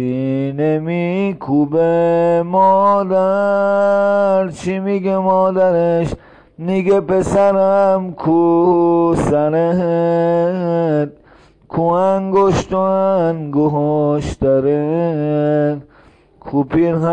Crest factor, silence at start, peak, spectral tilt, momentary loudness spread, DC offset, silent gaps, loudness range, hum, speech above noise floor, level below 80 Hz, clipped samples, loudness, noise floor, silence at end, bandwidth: 12 dB; 0 s; -4 dBFS; -8 dB/octave; 6 LU; under 0.1%; none; 2 LU; none; 33 dB; -42 dBFS; under 0.1%; -15 LUFS; -48 dBFS; 0 s; 10 kHz